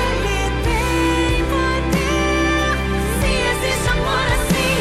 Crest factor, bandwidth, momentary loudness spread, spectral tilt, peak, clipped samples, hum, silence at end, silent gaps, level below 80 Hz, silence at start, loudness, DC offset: 12 dB; 15.5 kHz; 2 LU; -4.5 dB/octave; -6 dBFS; under 0.1%; none; 0 s; none; -24 dBFS; 0 s; -18 LUFS; under 0.1%